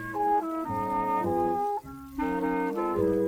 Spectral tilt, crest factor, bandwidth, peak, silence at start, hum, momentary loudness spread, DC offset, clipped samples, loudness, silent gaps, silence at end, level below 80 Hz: -7.5 dB/octave; 12 dB; 19.5 kHz; -16 dBFS; 0 s; none; 5 LU; under 0.1%; under 0.1%; -29 LUFS; none; 0 s; -52 dBFS